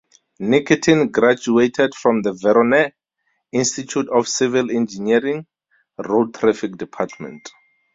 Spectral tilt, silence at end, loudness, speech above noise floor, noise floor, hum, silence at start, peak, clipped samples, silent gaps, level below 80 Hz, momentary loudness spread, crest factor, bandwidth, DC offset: -4.5 dB/octave; 0.45 s; -18 LUFS; 53 dB; -71 dBFS; none; 0.4 s; -2 dBFS; under 0.1%; none; -60 dBFS; 12 LU; 18 dB; 7.8 kHz; under 0.1%